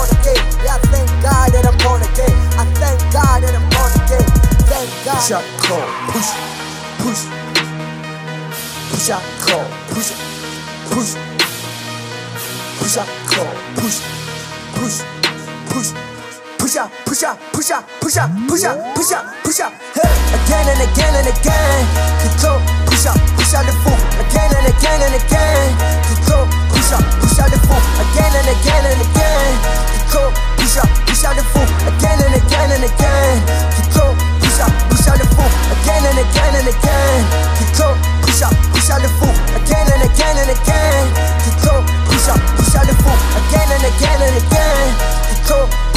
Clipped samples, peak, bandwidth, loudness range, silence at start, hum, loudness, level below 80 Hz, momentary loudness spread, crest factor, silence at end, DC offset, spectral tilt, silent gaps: under 0.1%; 0 dBFS; 16 kHz; 7 LU; 0 s; none; -14 LUFS; -14 dBFS; 9 LU; 12 dB; 0 s; under 0.1%; -4.5 dB/octave; none